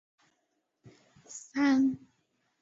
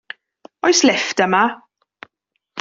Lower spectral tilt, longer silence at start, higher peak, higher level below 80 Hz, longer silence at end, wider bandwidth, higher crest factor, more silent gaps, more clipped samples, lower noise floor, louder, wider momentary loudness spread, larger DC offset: first, -4 dB/octave vs -2.5 dB/octave; first, 1.3 s vs 0.65 s; second, -14 dBFS vs 0 dBFS; second, -76 dBFS vs -64 dBFS; first, 0.65 s vs 0 s; about the same, 8 kHz vs 7.8 kHz; about the same, 18 dB vs 20 dB; neither; neither; first, -79 dBFS vs -73 dBFS; second, -28 LUFS vs -16 LUFS; second, 20 LU vs 23 LU; neither